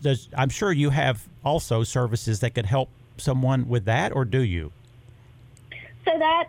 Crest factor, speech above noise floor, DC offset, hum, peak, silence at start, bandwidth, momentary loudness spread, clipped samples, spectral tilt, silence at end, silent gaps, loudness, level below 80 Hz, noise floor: 14 dB; 26 dB; under 0.1%; none; -10 dBFS; 0 s; 15.5 kHz; 10 LU; under 0.1%; -6 dB/octave; 0 s; none; -24 LUFS; -48 dBFS; -50 dBFS